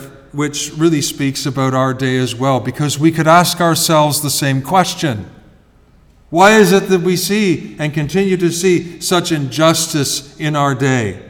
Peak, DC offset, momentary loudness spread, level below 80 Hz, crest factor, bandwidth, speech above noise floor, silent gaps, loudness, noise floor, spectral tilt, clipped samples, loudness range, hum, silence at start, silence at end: 0 dBFS; under 0.1%; 9 LU; -48 dBFS; 14 dB; 19.5 kHz; 34 dB; none; -14 LUFS; -48 dBFS; -4.5 dB/octave; under 0.1%; 2 LU; none; 0 s; 0 s